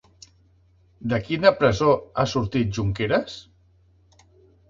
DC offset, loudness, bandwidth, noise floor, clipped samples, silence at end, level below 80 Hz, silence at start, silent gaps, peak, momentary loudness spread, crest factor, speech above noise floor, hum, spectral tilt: under 0.1%; -22 LUFS; 7.6 kHz; -58 dBFS; under 0.1%; 1.3 s; -46 dBFS; 1 s; none; -2 dBFS; 12 LU; 22 dB; 37 dB; none; -6 dB/octave